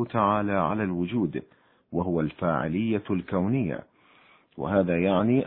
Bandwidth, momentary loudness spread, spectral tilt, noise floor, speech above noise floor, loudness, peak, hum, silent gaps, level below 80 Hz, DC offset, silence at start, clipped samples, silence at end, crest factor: 4.1 kHz; 8 LU; -11.5 dB/octave; -58 dBFS; 33 dB; -26 LUFS; -8 dBFS; none; none; -56 dBFS; under 0.1%; 0 s; under 0.1%; 0 s; 18 dB